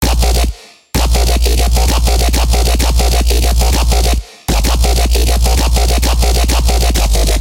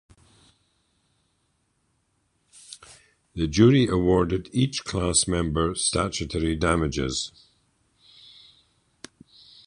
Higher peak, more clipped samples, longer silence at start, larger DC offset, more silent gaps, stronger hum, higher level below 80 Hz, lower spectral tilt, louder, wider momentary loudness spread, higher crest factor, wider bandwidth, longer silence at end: first, 0 dBFS vs -4 dBFS; neither; second, 0 s vs 2.7 s; first, 0.4% vs under 0.1%; neither; neither; first, -12 dBFS vs -42 dBFS; about the same, -4 dB/octave vs -4.5 dB/octave; first, -13 LUFS vs -23 LUFS; second, 3 LU vs 23 LU; second, 10 dB vs 22 dB; first, 17 kHz vs 11 kHz; second, 0 s vs 2.4 s